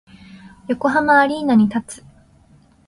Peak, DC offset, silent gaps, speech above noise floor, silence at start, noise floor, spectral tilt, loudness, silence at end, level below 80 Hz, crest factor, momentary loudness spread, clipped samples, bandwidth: -2 dBFS; under 0.1%; none; 36 dB; 0.45 s; -52 dBFS; -6 dB/octave; -17 LUFS; 0.9 s; -54 dBFS; 16 dB; 23 LU; under 0.1%; 11.5 kHz